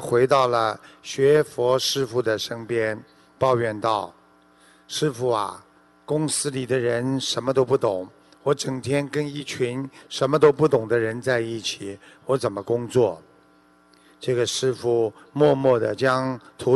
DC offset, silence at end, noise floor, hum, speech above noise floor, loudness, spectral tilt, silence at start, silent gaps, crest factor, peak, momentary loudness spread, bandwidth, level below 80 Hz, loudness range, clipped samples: under 0.1%; 0 s; -57 dBFS; none; 34 dB; -23 LUFS; -5 dB/octave; 0 s; none; 18 dB; -4 dBFS; 12 LU; 12.5 kHz; -62 dBFS; 4 LU; under 0.1%